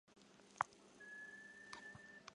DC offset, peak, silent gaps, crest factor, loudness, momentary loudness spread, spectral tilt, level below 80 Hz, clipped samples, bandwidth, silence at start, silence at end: under 0.1%; -20 dBFS; none; 34 dB; -52 LUFS; 18 LU; -2.5 dB/octave; -86 dBFS; under 0.1%; 11 kHz; 0.05 s; 0 s